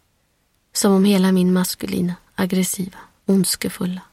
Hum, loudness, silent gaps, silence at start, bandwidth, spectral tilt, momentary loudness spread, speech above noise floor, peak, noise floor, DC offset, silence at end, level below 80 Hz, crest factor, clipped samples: none; -19 LUFS; none; 0.75 s; 16 kHz; -5 dB/octave; 11 LU; 46 dB; -4 dBFS; -65 dBFS; under 0.1%; 0.1 s; -54 dBFS; 16 dB; under 0.1%